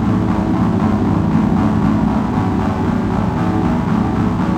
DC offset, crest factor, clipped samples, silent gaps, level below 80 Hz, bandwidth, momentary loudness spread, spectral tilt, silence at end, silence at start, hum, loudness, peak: under 0.1%; 12 dB; under 0.1%; none; -30 dBFS; 9.4 kHz; 2 LU; -8.5 dB/octave; 0 s; 0 s; none; -16 LUFS; -2 dBFS